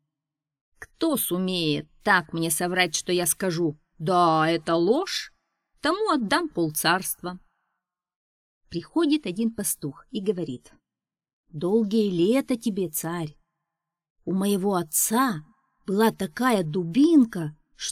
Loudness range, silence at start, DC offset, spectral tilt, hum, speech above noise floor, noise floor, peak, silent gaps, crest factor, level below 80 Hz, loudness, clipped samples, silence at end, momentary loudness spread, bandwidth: 6 LU; 0.8 s; under 0.1%; -4 dB/octave; none; over 66 dB; under -90 dBFS; -6 dBFS; 8.16-8.61 s, 11.33-11.44 s, 14.10-14.16 s; 20 dB; -62 dBFS; -24 LUFS; under 0.1%; 0 s; 12 LU; 17 kHz